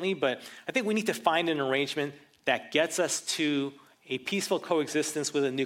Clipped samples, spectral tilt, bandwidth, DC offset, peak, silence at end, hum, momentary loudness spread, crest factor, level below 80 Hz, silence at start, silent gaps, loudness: under 0.1%; -3 dB/octave; 16.5 kHz; under 0.1%; -8 dBFS; 0 s; none; 8 LU; 22 dB; -80 dBFS; 0 s; none; -29 LUFS